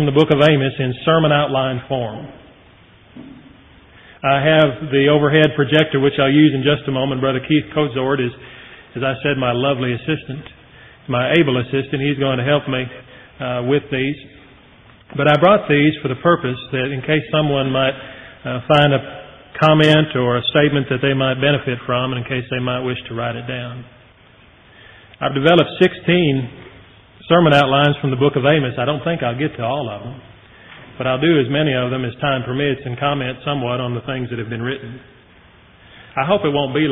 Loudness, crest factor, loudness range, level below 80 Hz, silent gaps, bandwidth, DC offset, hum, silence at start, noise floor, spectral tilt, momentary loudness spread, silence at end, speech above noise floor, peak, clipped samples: -17 LUFS; 18 dB; 6 LU; -50 dBFS; none; 5.8 kHz; under 0.1%; none; 0 s; -48 dBFS; -4.5 dB/octave; 14 LU; 0 s; 31 dB; 0 dBFS; under 0.1%